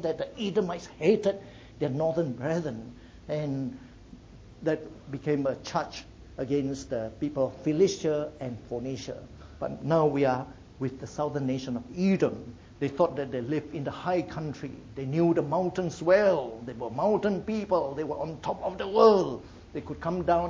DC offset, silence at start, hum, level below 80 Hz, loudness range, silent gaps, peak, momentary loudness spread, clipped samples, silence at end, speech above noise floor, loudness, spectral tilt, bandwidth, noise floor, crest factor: under 0.1%; 0 s; none; -54 dBFS; 6 LU; none; -6 dBFS; 14 LU; under 0.1%; 0 s; 21 dB; -29 LUFS; -7 dB/octave; 7.8 kHz; -49 dBFS; 22 dB